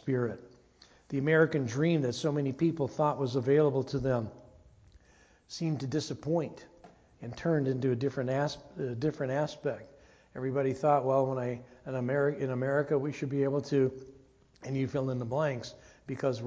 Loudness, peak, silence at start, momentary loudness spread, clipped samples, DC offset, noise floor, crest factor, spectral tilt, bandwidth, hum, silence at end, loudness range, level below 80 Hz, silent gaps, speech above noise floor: -31 LUFS; -12 dBFS; 0.05 s; 14 LU; under 0.1%; under 0.1%; -62 dBFS; 20 dB; -7 dB/octave; 8 kHz; none; 0 s; 5 LU; -62 dBFS; none; 32 dB